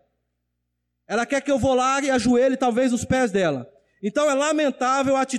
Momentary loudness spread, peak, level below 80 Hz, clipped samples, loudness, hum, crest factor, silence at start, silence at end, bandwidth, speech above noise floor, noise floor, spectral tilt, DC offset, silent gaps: 7 LU; -12 dBFS; -50 dBFS; under 0.1%; -21 LUFS; 60 Hz at -45 dBFS; 10 dB; 1.1 s; 0 s; 12.5 kHz; 56 dB; -77 dBFS; -4.5 dB/octave; under 0.1%; none